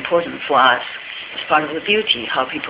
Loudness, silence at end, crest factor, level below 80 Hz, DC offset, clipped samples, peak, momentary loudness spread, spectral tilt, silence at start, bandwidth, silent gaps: -17 LUFS; 0 s; 18 dB; -58 dBFS; under 0.1%; under 0.1%; 0 dBFS; 13 LU; -7 dB/octave; 0 s; 4 kHz; none